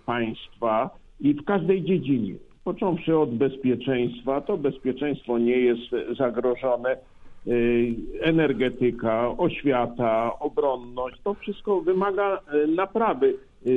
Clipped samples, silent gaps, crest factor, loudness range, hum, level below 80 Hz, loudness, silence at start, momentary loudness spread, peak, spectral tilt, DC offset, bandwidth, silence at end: under 0.1%; none; 16 dB; 1 LU; none; -52 dBFS; -25 LUFS; 0.05 s; 8 LU; -8 dBFS; -9 dB/octave; under 0.1%; 4 kHz; 0 s